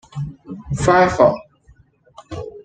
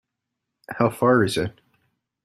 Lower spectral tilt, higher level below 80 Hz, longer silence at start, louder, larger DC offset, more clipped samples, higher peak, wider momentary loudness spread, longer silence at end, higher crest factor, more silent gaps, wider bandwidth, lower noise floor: about the same, -6 dB/octave vs -6 dB/octave; first, -42 dBFS vs -58 dBFS; second, 0.15 s vs 0.7 s; first, -16 LUFS vs -21 LUFS; neither; neither; about the same, -2 dBFS vs -4 dBFS; first, 19 LU vs 13 LU; second, 0.05 s vs 0.75 s; about the same, 18 dB vs 22 dB; neither; second, 9.2 kHz vs 15 kHz; second, -52 dBFS vs -82 dBFS